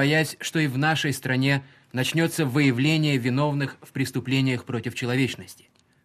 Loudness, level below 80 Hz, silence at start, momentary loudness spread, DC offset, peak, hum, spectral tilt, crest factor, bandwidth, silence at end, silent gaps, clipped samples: -24 LUFS; -62 dBFS; 0 s; 8 LU; under 0.1%; -8 dBFS; none; -5.5 dB/octave; 16 dB; 15 kHz; 0.5 s; none; under 0.1%